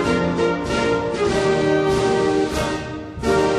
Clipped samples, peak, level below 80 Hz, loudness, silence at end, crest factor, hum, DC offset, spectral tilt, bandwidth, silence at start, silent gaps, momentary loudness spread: under 0.1%; -6 dBFS; -38 dBFS; -20 LUFS; 0 s; 12 dB; none; under 0.1%; -5.5 dB/octave; 13 kHz; 0 s; none; 6 LU